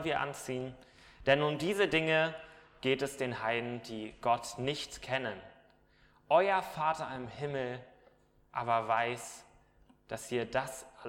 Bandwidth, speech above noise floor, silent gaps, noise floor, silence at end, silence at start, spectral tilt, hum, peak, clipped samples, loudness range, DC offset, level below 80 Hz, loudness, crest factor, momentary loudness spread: 16.5 kHz; 32 dB; none; -66 dBFS; 0 s; 0 s; -4.5 dB/octave; none; -12 dBFS; under 0.1%; 5 LU; under 0.1%; -64 dBFS; -33 LUFS; 22 dB; 14 LU